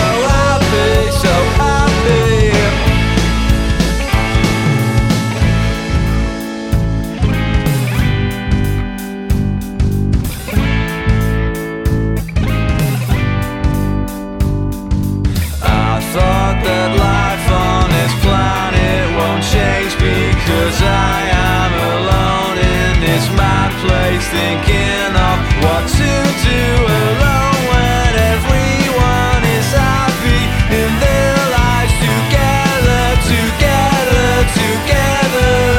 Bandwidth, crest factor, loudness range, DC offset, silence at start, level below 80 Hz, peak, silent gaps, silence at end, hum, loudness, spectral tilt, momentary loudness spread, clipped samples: 17 kHz; 12 dB; 4 LU; under 0.1%; 0 s; -18 dBFS; 0 dBFS; none; 0 s; none; -13 LUFS; -5.5 dB/octave; 5 LU; under 0.1%